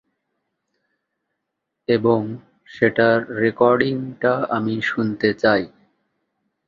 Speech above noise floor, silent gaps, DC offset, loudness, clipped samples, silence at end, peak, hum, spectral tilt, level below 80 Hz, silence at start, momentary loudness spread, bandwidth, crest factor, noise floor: 60 dB; none; under 0.1%; -19 LUFS; under 0.1%; 1 s; -2 dBFS; none; -7.5 dB/octave; -60 dBFS; 1.9 s; 6 LU; 7.4 kHz; 20 dB; -79 dBFS